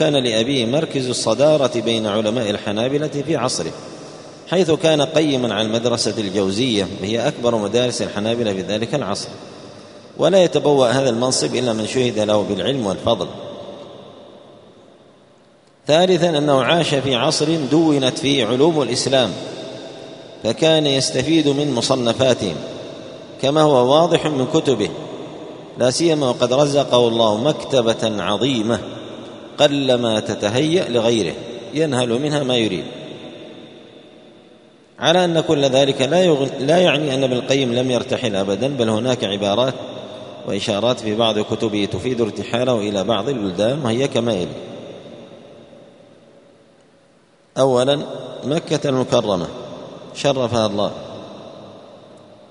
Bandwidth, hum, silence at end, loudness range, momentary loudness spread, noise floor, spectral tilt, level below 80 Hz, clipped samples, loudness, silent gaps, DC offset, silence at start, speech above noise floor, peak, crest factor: 11 kHz; none; 0.35 s; 6 LU; 18 LU; -54 dBFS; -5 dB/octave; -56 dBFS; under 0.1%; -18 LUFS; none; under 0.1%; 0 s; 36 dB; 0 dBFS; 18 dB